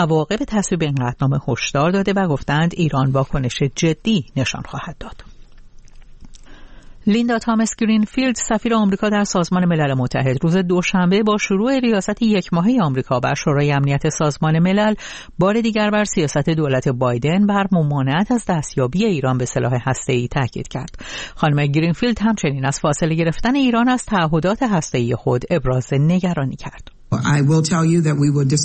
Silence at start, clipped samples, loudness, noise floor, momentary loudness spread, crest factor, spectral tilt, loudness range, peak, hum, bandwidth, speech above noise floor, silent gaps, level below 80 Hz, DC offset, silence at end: 0 s; under 0.1%; -18 LUFS; -40 dBFS; 6 LU; 12 dB; -6 dB/octave; 4 LU; -6 dBFS; none; 8.8 kHz; 22 dB; none; -40 dBFS; under 0.1%; 0 s